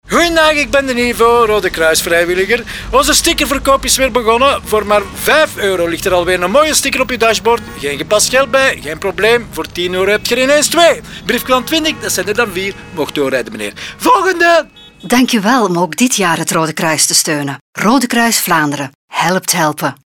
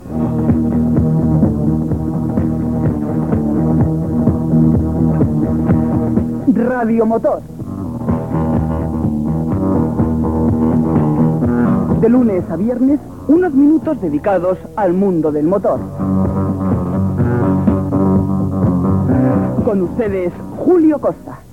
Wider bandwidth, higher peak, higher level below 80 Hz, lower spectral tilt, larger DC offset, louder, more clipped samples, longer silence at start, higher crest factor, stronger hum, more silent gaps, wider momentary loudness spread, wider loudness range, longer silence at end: first, 19.5 kHz vs 9.2 kHz; about the same, 0 dBFS vs 0 dBFS; about the same, -36 dBFS vs -32 dBFS; second, -2.5 dB/octave vs -11 dB/octave; about the same, 0.2% vs 0.4%; first, -12 LUFS vs -15 LUFS; neither; about the same, 0.05 s vs 0 s; about the same, 12 dB vs 14 dB; neither; first, 17.61-17.73 s, 18.95-19.08 s vs none; about the same, 8 LU vs 6 LU; about the same, 2 LU vs 3 LU; about the same, 0.1 s vs 0 s